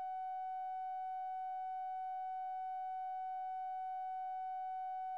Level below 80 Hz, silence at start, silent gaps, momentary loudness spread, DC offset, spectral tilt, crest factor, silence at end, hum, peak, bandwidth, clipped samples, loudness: under -90 dBFS; 0 s; none; 0 LU; under 0.1%; -1 dB/octave; 4 dB; 0 s; none; -38 dBFS; 4.8 kHz; under 0.1%; -43 LUFS